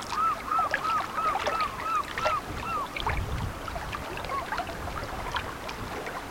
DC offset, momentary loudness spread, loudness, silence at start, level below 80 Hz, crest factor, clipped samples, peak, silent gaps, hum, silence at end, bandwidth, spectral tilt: under 0.1%; 8 LU; -30 LUFS; 0 s; -44 dBFS; 18 dB; under 0.1%; -14 dBFS; none; none; 0 s; 17 kHz; -4 dB/octave